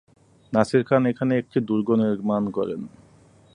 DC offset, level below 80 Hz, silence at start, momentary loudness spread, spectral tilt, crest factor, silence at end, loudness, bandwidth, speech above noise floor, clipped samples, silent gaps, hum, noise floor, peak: under 0.1%; -60 dBFS; 0.5 s; 9 LU; -8 dB/octave; 22 dB; 0.65 s; -23 LUFS; 10.5 kHz; 32 dB; under 0.1%; none; none; -54 dBFS; -2 dBFS